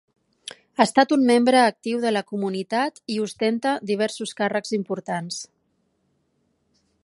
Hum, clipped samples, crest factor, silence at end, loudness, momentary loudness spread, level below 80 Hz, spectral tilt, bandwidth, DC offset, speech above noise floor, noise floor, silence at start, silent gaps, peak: none; under 0.1%; 22 dB; 1.6 s; -22 LUFS; 16 LU; -74 dBFS; -4.5 dB/octave; 11.5 kHz; under 0.1%; 48 dB; -70 dBFS; 0.8 s; none; -2 dBFS